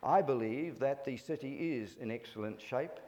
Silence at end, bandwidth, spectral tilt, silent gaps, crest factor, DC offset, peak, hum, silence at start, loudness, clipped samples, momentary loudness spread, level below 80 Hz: 0 s; 18.5 kHz; -7 dB/octave; none; 18 dB; under 0.1%; -18 dBFS; none; 0 s; -37 LUFS; under 0.1%; 11 LU; -78 dBFS